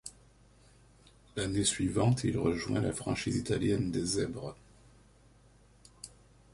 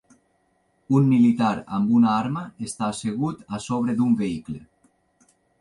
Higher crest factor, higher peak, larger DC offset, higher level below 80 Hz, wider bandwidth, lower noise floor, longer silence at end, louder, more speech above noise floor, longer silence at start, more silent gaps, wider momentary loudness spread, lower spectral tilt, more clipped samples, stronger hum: about the same, 18 dB vs 16 dB; second, -16 dBFS vs -8 dBFS; neither; first, -54 dBFS vs -60 dBFS; about the same, 11.5 kHz vs 11.5 kHz; second, -61 dBFS vs -67 dBFS; second, 0.45 s vs 1 s; second, -32 LUFS vs -23 LUFS; second, 30 dB vs 45 dB; second, 0.05 s vs 0.9 s; neither; first, 20 LU vs 15 LU; second, -5 dB/octave vs -7 dB/octave; neither; first, 50 Hz at -55 dBFS vs none